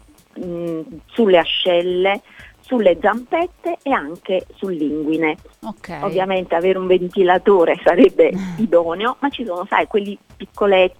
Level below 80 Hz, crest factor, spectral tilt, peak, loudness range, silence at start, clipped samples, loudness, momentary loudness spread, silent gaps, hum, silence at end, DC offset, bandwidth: -50 dBFS; 16 dB; -6.5 dB/octave; 0 dBFS; 6 LU; 0.35 s; under 0.1%; -17 LUFS; 14 LU; none; none; 0.1 s; under 0.1%; 11 kHz